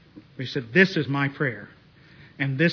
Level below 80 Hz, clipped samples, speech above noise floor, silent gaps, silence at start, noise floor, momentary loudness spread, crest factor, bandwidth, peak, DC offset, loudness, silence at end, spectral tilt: -64 dBFS; under 0.1%; 28 dB; none; 0.15 s; -51 dBFS; 13 LU; 20 dB; 5.4 kHz; -4 dBFS; under 0.1%; -24 LUFS; 0 s; -7 dB/octave